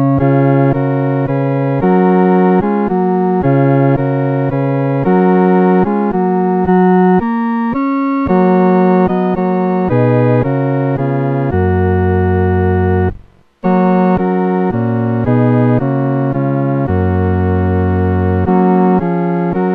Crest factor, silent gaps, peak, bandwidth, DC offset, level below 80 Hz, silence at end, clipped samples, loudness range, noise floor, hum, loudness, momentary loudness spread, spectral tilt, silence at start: 12 dB; none; 0 dBFS; 4.4 kHz; 0.1%; -38 dBFS; 0 s; under 0.1%; 2 LU; -38 dBFS; none; -13 LUFS; 5 LU; -11.5 dB/octave; 0 s